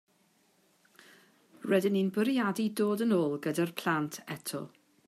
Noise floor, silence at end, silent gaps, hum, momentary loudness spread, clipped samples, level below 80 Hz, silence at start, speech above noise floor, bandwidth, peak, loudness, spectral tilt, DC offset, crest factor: -69 dBFS; 0.4 s; none; none; 11 LU; under 0.1%; -82 dBFS; 1.6 s; 39 dB; 15.5 kHz; -14 dBFS; -31 LUFS; -5.5 dB/octave; under 0.1%; 18 dB